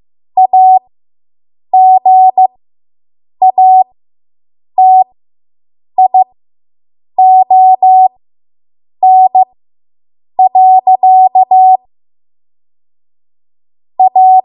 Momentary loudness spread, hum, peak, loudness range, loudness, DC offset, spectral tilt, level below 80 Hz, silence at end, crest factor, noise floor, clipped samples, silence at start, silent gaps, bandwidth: 11 LU; none; 0 dBFS; 3 LU; -7 LUFS; under 0.1%; -9 dB/octave; -70 dBFS; 0.05 s; 8 dB; under -90 dBFS; under 0.1%; 0.35 s; none; 1 kHz